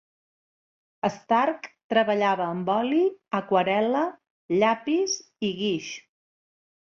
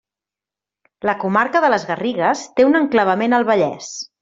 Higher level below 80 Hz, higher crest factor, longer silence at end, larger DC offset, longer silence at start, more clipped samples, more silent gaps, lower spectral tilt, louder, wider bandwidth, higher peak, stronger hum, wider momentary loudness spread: second, -72 dBFS vs -62 dBFS; about the same, 18 dB vs 16 dB; first, 0.8 s vs 0.15 s; neither; about the same, 1.05 s vs 1.05 s; neither; first, 1.84-1.90 s, 4.30-4.49 s vs none; about the same, -4.5 dB/octave vs -5 dB/octave; second, -25 LUFS vs -17 LUFS; about the same, 7.4 kHz vs 7.8 kHz; second, -8 dBFS vs -2 dBFS; neither; about the same, 8 LU vs 8 LU